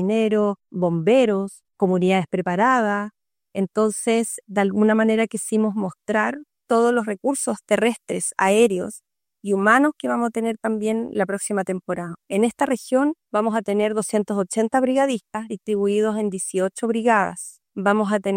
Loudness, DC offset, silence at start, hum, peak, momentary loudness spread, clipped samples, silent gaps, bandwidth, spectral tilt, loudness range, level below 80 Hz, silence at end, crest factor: -21 LUFS; under 0.1%; 0 s; none; -2 dBFS; 9 LU; under 0.1%; none; 16.5 kHz; -5 dB/octave; 2 LU; -68 dBFS; 0 s; 18 dB